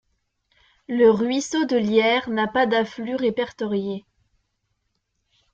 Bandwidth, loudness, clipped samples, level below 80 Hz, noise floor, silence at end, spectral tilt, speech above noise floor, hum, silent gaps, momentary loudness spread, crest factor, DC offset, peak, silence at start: 8.4 kHz; -21 LUFS; under 0.1%; -62 dBFS; -74 dBFS; 1.55 s; -4.5 dB/octave; 53 dB; none; none; 9 LU; 18 dB; under 0.1%; -4 dBFS; 0.9 s